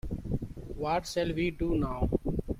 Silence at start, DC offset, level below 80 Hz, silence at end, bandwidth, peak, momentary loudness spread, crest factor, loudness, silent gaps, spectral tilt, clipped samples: 0.05 s; under 0.1%; -40 dBFS; 0 s; 16 kHz; -14 dBFS; 7 LU; 18 dB; -32 LUFS; none; -6.5 dB/octave; under 0.1%